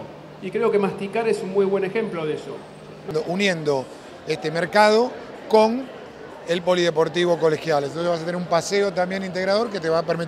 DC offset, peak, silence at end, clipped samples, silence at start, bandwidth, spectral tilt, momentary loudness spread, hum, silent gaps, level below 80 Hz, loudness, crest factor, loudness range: under 0.1%; -2 dBFS; 0 s; under 0.1%; 0 s; 13.5 kHz; -5 dB/octave; 18 LU; none; none; -62 dBFS; -22 LUFS; 20 dB; 4 LU